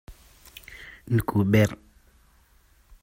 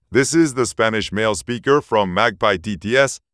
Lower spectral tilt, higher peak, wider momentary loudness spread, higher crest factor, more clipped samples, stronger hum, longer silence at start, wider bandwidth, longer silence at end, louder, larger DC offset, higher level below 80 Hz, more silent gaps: first, -7 dB/octave vs -4 dB/octave; second, -6 dBFS vs -2 dBFS; first, 24 LU vs 4 LU; about the same, 20 dB vs 16 dB; neither; neither; about the same, 0.1 s vs 0.1 s; first, 16 kHz vs 11 kHz; first, 1.25 s vs 0.15 s; second, -24 LUFS vs -18 LUFS; neither; about the same, -50 dBFS vs -48 dBFS; neither